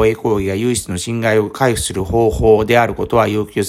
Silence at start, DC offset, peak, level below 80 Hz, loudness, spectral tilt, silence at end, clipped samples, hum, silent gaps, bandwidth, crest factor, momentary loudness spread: 0 s; under 0.1%; 0 dBFS; -34 dBFS; -15 LUFS; -5 dB/octave; 0 s; under 0.1%; none; none; 15.5 kHz; 14 dB; 6 LU